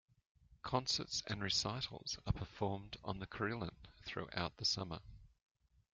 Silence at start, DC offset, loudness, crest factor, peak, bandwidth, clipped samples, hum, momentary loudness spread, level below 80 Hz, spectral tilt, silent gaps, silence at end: 0.65 s; under 0.1%; -41 LUFS; 24 dB; -20 dBFS; 9.4 kHz; under 0.1%; none; 11 LU; -58 dBFS; -3.5 dB/octave; none; 0.65 s